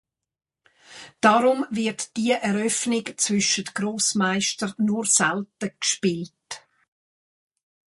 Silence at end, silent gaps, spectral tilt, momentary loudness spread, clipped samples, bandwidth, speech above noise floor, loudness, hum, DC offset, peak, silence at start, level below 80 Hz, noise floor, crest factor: 1.3 s; none; -3 dB/octave; 14 LU; under 0.1%; 11.5 kHz; 65 dB; -22 LUFS; none; under 0.1%; -4 dBFS; 0.9 s; -68 dBFS; -88 dBFS; 20 dB